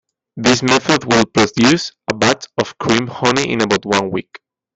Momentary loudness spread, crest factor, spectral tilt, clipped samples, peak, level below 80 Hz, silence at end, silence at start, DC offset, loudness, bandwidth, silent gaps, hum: 7 LU; 16 dB; -4 dB/octave; under 0.1%; 0 dBFS; -50 dBFS; 0.55 s; 0.35 s; under 0.1%; -15 LUFS; 8.4 kHz; none; none